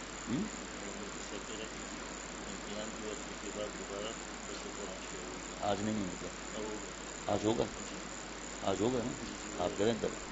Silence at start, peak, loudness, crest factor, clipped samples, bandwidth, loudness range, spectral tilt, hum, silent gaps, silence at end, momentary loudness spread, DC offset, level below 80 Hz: 0 s; -16 dBFS; -39 LUFS; 22 dB; under 0.1%; 8 kHz; 5 LU; -4 dB/octave; none; none; 0 s; 9 LU; under 0.1%; -56 dBFS